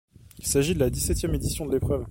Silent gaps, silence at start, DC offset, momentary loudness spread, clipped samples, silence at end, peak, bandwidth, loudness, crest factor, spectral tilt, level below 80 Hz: none; 0.25 s; under 0.1%; 5 LU; under 0.1%; 0 s; -8 dBFS; 16.5 kHz; -26 LUFS; 18 dB; -5 dB/octave; -36 dBFS